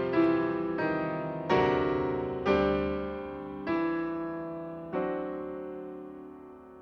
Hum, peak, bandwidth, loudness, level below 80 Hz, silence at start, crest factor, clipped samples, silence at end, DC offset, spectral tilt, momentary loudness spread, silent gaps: none; -12 dBFS; 6.6 kHz; -31 LUFS; -52 dBFS; 0 s; 18 dB; under 0.1%; 0 s; under 0.1%; -8 dB/octave; 16 LU; none